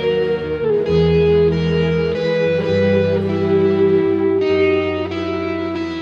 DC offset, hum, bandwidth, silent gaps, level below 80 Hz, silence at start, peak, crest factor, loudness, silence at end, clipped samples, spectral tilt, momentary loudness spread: under 0.1%; none; 7 kHz; none; -38 dBFS; 0 s; -4 dBFS; 12 dB; -17 LUFS; 0 s; under 0.1%; -8 dB/octave; 7 LU